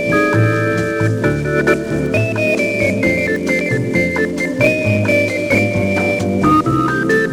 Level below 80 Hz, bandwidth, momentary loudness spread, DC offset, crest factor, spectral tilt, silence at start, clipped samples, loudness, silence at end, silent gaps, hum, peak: -40 dBFS; 16 kHz; 3 LU; under 0.1%; 14 dB; -6.5 dB/octave; 0 s; under 0.1%; -15 LUFS; 0 s; none; none; -2 dBFS